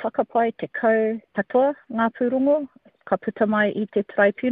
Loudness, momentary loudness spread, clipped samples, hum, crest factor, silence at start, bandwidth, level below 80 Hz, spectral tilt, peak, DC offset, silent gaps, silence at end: -22 LUFS; 6 LU; under 0.1%; none; 16 dB; 0 s; 4.1 kHz; -64 dBFS; -5 dB/octave; -6 dBFS; under 0.1%; none; 0 s